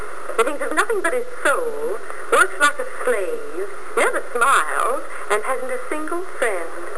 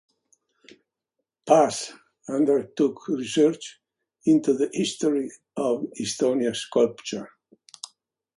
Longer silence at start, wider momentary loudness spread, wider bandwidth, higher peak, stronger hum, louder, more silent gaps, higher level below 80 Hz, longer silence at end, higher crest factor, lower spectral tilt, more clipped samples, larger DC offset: second, 0 s vs 1.45 s; second, 11 LU vs 20 LU; about the same, 11 kHz vs 11.5 kHz; about the same, -2 dBFS vs -4 dBFS; neither; first, -21 LUFS vs -24 LUFS; neither; first, -58 dBFS vs -70 dBFS; second, 0 s vs 1.1 s; about the same, 20 dB vs 20 dB; second, -2 dB/octave vs -4.5 dB/octave; neither; first, 7% vs under 0.1%